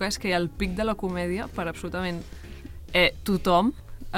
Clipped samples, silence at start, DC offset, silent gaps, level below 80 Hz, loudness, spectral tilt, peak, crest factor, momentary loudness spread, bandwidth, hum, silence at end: under 0.1%; 0 s; under 0.1%; none; -40 dBFS; -26 LUFS; -5 dB/octave; -8 dBFS; 18 dB; 21 LU; 16.5 kHz; none; 0 s